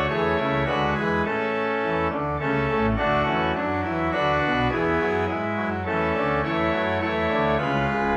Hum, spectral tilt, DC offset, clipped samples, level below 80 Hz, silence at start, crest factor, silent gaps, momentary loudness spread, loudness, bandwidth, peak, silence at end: none; -7.5 dB/octave; under 0.1%; under 0.1%; -42 dBFS; 0 s; 14 dB; none; 3 LU; -23 LUFS; 8.4 kHz; -10 dBFS; 0 s